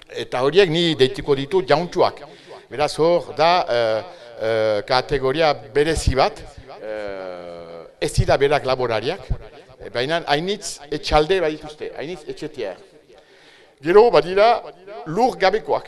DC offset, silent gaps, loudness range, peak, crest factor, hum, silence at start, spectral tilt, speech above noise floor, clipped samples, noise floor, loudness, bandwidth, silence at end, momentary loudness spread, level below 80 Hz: under 0.1%; none; 4 LU; 0 dBFS; 20 dB; none; 0.1 s; -5 dB/octave; 30 dB; under 0.1%; -50 dBFS; -19 LUFS; 12.5 kHz; 0 s; 17 LU; -36 dBFS